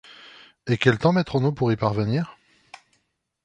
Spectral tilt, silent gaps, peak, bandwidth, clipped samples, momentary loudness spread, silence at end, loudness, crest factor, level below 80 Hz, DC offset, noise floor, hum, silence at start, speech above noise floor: -7.5 dB/octave; none; -2 dBFS; 9.6 kHz; under 0.1%; 19 LU; 1.15 s; -22 LUFS; 22 dB; -54 dBFS; under 0.1%; -72 dBFS; none; 0.65 s; 51 dB